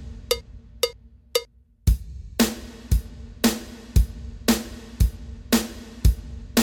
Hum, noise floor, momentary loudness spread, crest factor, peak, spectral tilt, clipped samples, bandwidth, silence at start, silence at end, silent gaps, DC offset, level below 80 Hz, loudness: none; -40 dBFS; 10 LU; 18 dB; -6 dBFS; -4.5 dB/octave; under 0.1%; 18 kHz; 0 s; 0 s; none; under 0.1%; -28 dBFS; -26 LUFS